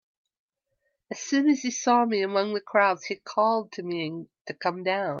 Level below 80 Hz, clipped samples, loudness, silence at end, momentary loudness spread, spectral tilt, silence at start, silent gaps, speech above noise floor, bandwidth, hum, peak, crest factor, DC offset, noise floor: -80 dBFS; under 0.1%; -26 LUFS; 0 s; 12 LU; -4 dB/octave; 1.1 s; 4.41-4.45 s; 52 dB; 7.4 kHz; none; -10 dBFS; 18 dB; under 0.1%; -77 dBFS